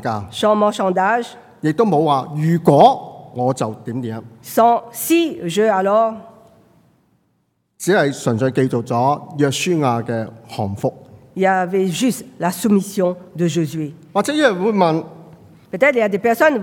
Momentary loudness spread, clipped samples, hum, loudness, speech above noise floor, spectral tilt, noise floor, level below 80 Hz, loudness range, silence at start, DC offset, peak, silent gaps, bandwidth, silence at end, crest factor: 11 LU; under 0.1%; none; -18 LUFS; 49 dB; -5.5 dB/octave; -66 dBFS; -64 dBFS; 4 LU; 0 s; under 0.1%; 0 dBFS; none; 18 kHz; 0 s; 18 dB